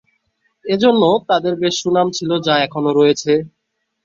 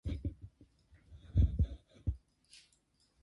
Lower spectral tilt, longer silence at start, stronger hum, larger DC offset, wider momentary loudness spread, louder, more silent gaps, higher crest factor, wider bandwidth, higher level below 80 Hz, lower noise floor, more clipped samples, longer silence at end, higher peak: second, -4.5 dB/octave vs -8.5 dB/octave; first, 0.65 s vs 0.05 s; neither; neither; second, 6 LU vs 26 LU; first, -16 LUFS vs -37 LUFS; neither; about the same, 16 dB vs 20 dB; second, 7.8 kHz vs 11 kHz; second, -58 dBFS vs -40 dBFS; second, -65 dBFS vs -74 dBFS; neither; second, 0.55 s vs 1.05 s; first, -2 dBFS vs -18 dBFS